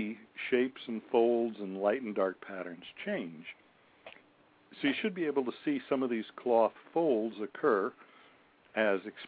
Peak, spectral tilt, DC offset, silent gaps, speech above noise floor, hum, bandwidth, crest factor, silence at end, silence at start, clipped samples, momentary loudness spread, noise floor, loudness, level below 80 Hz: -14 dBFS; -3.5 dB/octave; under 0.1%; none; 32 dB; none; 4.8 kHz; 20 dB; 0 s; 0 s; under 0.1%; 13 LU; -65 dBFS; -33 LUFS; -82 dBFS